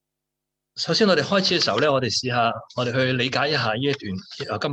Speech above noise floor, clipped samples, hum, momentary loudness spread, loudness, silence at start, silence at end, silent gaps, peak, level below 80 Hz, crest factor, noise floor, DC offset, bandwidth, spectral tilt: 61 dB; under 0.1%; none; 11 LU; -21 LUFS; 0.75 s; 0 s; none; -6 dBFS; -64 dBFS; 16 dB; -83 dBFS; under 0.1%; 9.2 kHz; -4.5 dB/octave